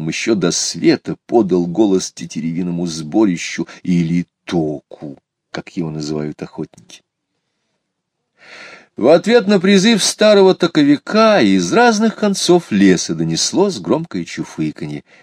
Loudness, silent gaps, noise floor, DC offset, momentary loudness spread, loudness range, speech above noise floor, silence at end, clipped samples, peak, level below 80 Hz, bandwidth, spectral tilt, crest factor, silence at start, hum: -15 LUFS; none; -74 dBFS; under 0.1%; 17 LU; 16 LU; 59 dB; 0.2 s; under 0.1%; 0 dBFS; -56 dBFS; 14.5 kHz; -4.5 dB/octave; 16 dB; 0 s; none